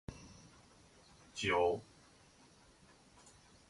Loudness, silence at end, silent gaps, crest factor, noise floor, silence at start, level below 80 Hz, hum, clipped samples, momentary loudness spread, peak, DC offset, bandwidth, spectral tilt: -36 LUFS; 1.85 s; none; 22 dB; -65 dBFS; 0.1 s; -64 dBFS; none; under 0.1%; 28 LU; -22 dBFS; under 0.1%; 11.5 kHz; -4 dB/octave